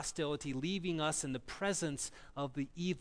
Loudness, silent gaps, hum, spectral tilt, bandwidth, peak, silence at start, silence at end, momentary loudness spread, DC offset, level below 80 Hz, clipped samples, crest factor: -38 LUFS; none; none; -4 dB/octave; 11 kHz; -22 dBFS; 0 s; 0 s; 7 LU; under 0.1%; -60 dBFS; under 0.1%; 16 dB